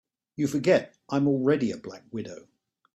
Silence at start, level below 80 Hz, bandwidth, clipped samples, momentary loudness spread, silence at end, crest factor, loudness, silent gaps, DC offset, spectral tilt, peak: 0.4 s; -66 dBFS; 13.5 kHz; under 0.1%; 17 LU; 0.55 s; 18 dB; -26 LUFS; none; under 0.1%; -6.5 dB/octave; -10 dBFS